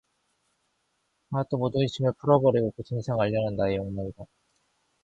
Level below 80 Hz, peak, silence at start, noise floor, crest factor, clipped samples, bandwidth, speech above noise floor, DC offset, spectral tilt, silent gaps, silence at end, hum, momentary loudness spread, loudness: -54 dBFS; -6 dBFS; 1.3 s; -74 dBFS; 22 dB; under 0.1%; 8 kHz; 49 dB; under 0.1%; -8 dB/octave; none; 0.8 s; none; 12 LU; -26 LUFS